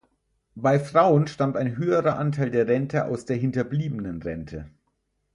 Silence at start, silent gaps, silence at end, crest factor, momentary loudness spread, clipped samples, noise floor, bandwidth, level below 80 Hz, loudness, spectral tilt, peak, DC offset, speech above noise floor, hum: 0.55 s; none; 0.65 s; 20 dB; 13 LU; under 0.1%; -74 dBFS; 11 kHz; -54 dBFS; -24 LUFS; -8 dB/octave; -4 dBFS; under 0.1%; 50 dB; none